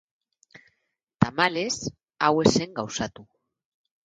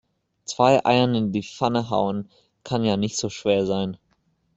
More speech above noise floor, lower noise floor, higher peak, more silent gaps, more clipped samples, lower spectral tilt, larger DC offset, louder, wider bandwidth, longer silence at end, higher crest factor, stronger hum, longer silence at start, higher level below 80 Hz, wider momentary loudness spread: first, 52 dB vs 45 dB; first, -77 dBFS vs -67 dBFS; about the same, -2 dBFS vs -4 dBFS; neither; neither; about the same, -4.5 dB/octave vs -5.5 dB/octave; neither; second, -25 LUFS vs -22 LUFS; first, 10.5 kHz vs 8.2 kHz; first, 0.8 s vs 0.6 s; first, 26 dB vs 20 dB; neither; first, 1.2 s vs 0.5 s; first, -54 dBFS vs -60 dBFS; second, 11 LU vs 15 LU